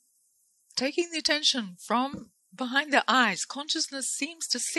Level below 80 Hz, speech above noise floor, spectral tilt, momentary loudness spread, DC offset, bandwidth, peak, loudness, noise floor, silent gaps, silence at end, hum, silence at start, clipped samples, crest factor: -72 dBFS; 41 dB; -1 dB/octave; 9 LU; under 0.1%; 12.5 kHz; -6 dBFS; -27 LUFS; -69 dBFS; none; 0 s; none; 0.75 s; under 0.1%; 24 dB